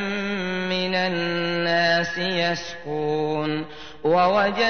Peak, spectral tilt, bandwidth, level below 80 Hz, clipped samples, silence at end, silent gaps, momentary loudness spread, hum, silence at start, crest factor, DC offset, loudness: -6 dBFS; -5 dB/octave; 6.6 kHz; -56 dBFS; under 0.1%; 0 s; none; 9 LU; none; 0 s; 16 dB; 0.7%; -23 LUFS